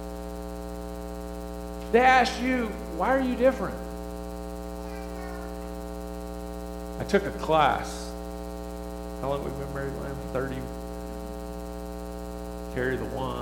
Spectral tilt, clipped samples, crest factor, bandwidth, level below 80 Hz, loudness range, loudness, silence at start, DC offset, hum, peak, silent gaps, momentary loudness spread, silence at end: -5.5 dB/octave; under 0.1%; 22 dB; 19 kHz; -40 dBFS; 10 LU; -30 LUFS; 0 s; under 0.1%; 60 Hz at -40 dBFS; -6 dBFS; none; 14 LU; 0 s